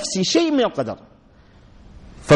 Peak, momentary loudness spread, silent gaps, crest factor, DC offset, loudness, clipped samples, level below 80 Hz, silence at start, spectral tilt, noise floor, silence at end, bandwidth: -4 dBFS; 20 LU; none; 16 dB; under 0.1%; -20 LUFS; under 0.1%; -50 dBFS; 0 s; -4.5 dB/octave; -50 dBFS; 0 s; 11 kHz